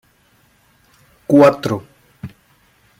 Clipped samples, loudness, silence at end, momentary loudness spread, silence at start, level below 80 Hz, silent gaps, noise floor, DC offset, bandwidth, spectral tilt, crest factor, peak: under 0.1%; -14 LUFS; 0.75 s; 25 LU; 1.3 s; -58 dBFS; none; -56 dBFS; under 0.1%; 15.5 kHz; -7 dB/octave; 18 dB; -2 dBFS